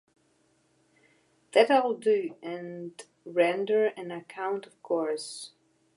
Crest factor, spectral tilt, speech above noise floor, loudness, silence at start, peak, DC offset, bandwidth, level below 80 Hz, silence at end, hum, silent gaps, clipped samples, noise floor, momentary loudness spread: 24 dB; -4 dB/octave; 41 dB; -28 LUFS; 1.55 s; -6 dBFS; under 0.1%; 11.5 kHz; -86 dBFS; 0.5 s; none; none; under 0.1%; -69 dBFS; 18 LU